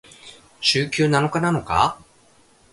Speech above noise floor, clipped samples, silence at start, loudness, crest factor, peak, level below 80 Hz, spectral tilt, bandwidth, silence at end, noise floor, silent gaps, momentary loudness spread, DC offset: 35 dB; under 0.1%; 0.25 s; -20 LUFS; 20 dB; -4 dBFS; -46 dBFS; -4.5 dB/octave; 11.5 kHz; 0.8 s; -55 dBFS; none; 3 LU; under 0.1%